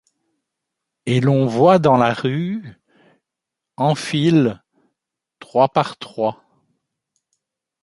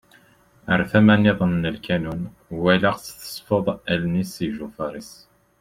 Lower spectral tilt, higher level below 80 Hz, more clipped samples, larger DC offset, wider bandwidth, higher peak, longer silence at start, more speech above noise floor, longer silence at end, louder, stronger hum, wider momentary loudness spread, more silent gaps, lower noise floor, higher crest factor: about the same, -7 dB/octave vs -6.5 dB/octave; second, -60 dBFS vs -50 dBFS; neither; neither; second, 11.5 kHz vs 16 kHz; about the same, -2 dBFS vs -2 dBFS; first, 1.05 s vs 0.65 s; first, 67 dB vs 34 dB; first, 1.5 s vs 0.45 s; first, -18 LUFS vs -21 LUFS; neither; second, 12 LU vs 17 LU; neither; first, -84 dBFS vs -55 dBFS; about the same, 18 dB vs 20 dB